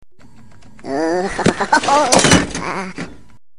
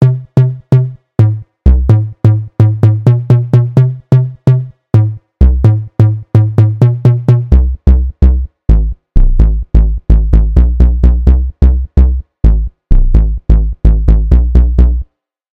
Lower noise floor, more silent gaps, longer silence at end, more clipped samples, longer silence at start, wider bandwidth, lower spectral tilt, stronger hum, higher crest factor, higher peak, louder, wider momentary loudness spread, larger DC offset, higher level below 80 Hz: first, -46 dBFS vs -32 dBFS; neither; about the same, 0.45 s vs 0.55 s; neither; first, 0.85 s vs 0 s; first, 14.5 kHz vs 3.7 kHz; second, -3.5 dB/octave vs -10.5 dB/octave; neither; first, 18 dB vs 8 dB; about the same, 0 dBFS vs 0 dBFS; second, -15 LUFS vs -11 LUFS; first, 19 LU vs 4 LU; first, 2% vs under 0.1%; second, -40 dBFS vs -10 dBFS